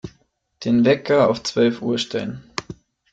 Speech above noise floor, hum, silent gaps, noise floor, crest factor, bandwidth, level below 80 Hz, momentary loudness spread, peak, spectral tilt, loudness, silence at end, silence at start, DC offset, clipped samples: 43 dB; none; none; -62 dBFS; 16 dB; 8 kHz; -56 dBFS; 15 LU; -4 dBFS; -5.5 dB/octave; -20 LUFS; 0.4 s; 0.05 s; under 0.1%; under 0.1%